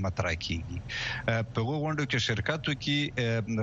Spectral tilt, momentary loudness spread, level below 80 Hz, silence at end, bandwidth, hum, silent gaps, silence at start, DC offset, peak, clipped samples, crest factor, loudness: -5 dB/octave; 5 LU; -48 dBFS; 0 s; 7.8 kHz; none; none; 0 s; under 0.1%; -12 dBFS; under 0.1%; 18 dB; -30 LUFS